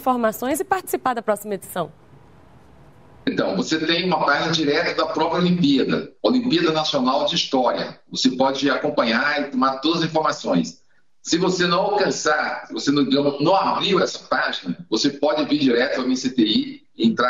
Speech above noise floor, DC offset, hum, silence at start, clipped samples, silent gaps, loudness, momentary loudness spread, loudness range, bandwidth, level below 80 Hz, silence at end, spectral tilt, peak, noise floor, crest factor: 29 dB; 0.2%; none; 0 s; under 0.1%; none; -20 LUFS; 6 LU; 4 LU; 16 kHz; -62 dBFS; 0 s; -4.5 dB/octave; -4 dBFS; -49 dBFS; 16 dB